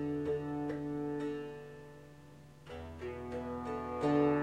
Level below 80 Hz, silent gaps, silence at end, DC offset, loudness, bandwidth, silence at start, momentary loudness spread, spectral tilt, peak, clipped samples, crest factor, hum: -60 dBFS; none; 0 s; under 0.1%; -38 LUFS; 9.6 kHz; 0 s; 22 LU; -8 dB/octave; -20 dBFS; under 0.1%; 18 dB; none